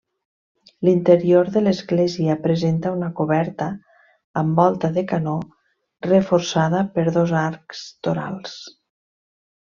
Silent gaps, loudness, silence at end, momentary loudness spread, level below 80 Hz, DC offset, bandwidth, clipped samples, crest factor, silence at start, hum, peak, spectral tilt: 4.24-4.34 s; -20 LUFS; 1 s; 14 LU; -60 dBFS; under 0.1%; 7.2 kHz; under 0.1%; 18 dB; 0.8 s; none; -2 dBFS; -7 dB/octave